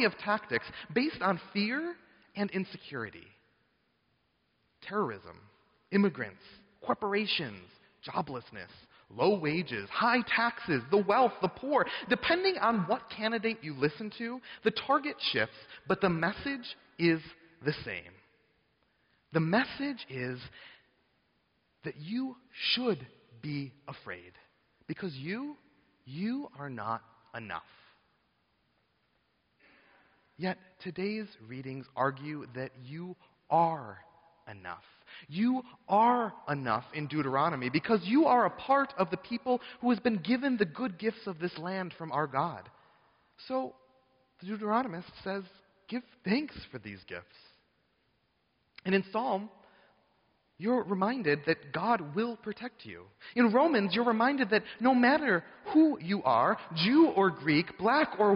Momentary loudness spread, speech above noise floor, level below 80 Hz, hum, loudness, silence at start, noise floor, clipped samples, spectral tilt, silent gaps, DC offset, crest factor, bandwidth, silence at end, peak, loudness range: 17 LU; 44 dB; -70 dBFS; none; -31 LUFS; 0 s; -75 dBFS; under 0.1%; -3.5 dB/octave; none; under 0.1%; 18 dB; 5.4 kHz; 0 s; -14 dBFS; 12 LU